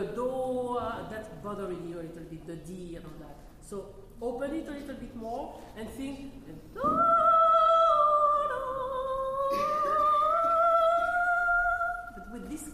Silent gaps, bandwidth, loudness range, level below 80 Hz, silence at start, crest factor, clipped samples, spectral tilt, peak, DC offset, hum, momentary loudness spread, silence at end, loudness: none; 15 kHz; 15 LU; -52 dBFS; 0 s; 16 dB; under 0.1%; -5 dB/octave; -12 dBFS; under 0.1%; none; 21 LU; 0 s; -26 LUFS